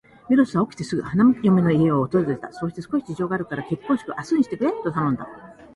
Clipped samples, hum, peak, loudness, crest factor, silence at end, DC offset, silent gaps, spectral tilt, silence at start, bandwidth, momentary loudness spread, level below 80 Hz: under 0.1%; none; -6 dBFS; -22 LUFS; 16 dB; 0.1 s; under 0.1%; none; -8 dB/octave; 0.3 s; 11.5 kHz; 10 LU; -56 dBFS